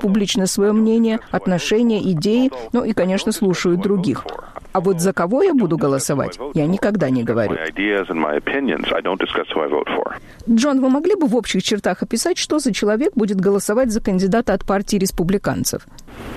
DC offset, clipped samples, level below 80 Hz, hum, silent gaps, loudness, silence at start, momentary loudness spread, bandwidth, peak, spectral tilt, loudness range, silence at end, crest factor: under 0.1%; under 0.1%; -42 dBFS; none; none; -18 LUFS; 0 s; 6 LU; 14.5 kHz; -6 dBFS; -5 dB/octave; 2 LU; 0 s; 12 dB